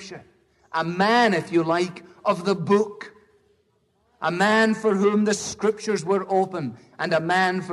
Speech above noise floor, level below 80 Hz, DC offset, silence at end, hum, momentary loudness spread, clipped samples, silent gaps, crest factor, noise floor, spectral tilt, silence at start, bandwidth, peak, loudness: 44 dB; -66 dBFS; under 0.1%; 0 s; none; 12 LU; under 0.1%; none; 16 dB; -67 dBFS; -5 dB/octave; 0 s; 12 kHz; -6 dBFS; -22 LUFS